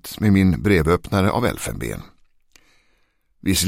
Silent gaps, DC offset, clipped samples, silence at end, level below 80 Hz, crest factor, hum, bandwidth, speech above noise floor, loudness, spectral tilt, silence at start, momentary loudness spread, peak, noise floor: none; under 0.1%; under 0.1%; 0 s; -38 dBFS; 18 dB; none; 16.5 kHz; 44 dB; -20 LUFS; -5.5 dB/octave; 0.05 s; 13 LU; -4 dBFS; -62 dBFS